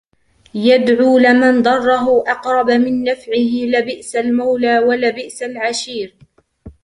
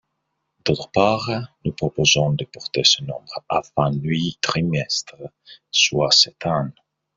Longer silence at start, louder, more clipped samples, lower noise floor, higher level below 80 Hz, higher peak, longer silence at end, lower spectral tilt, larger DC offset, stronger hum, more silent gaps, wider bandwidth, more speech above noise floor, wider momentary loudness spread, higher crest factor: about the same, 0.55 s vs 0.65 s; first, -14 LUFS vs -19 LUFS; neither; second, -54 dBFS vs -76 dBFS; about the same, -54 dBFS vs -52 dBFS; about the same, -2 dBFS vs 0 dBFS; second, 0.15 s vs 0.45 s; about the same, -4 dB/octave vs -3.5 dB/octave; neither; neither; neither; first, 11 kHz vs 7.8 kHz; second, 39 dB vs 54 dB; about the same, 12 LU vs 14 LU; second, 14 dB vs 20 dB